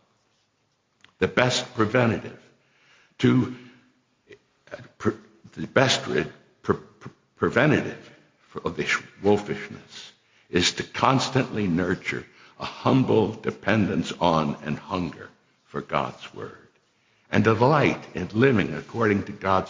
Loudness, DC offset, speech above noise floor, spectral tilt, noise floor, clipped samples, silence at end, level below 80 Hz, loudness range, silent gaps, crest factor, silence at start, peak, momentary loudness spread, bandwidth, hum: -24 LUFS; under 0.1%; 47 dB; -5.5 dB/octave; -70 dBFS; under 0.1%; 0 s; -52 dBFS; 4 LU; none; 22 dB; 1.2 s; -4 dBFS; 19 LU; 7.6 kHz; none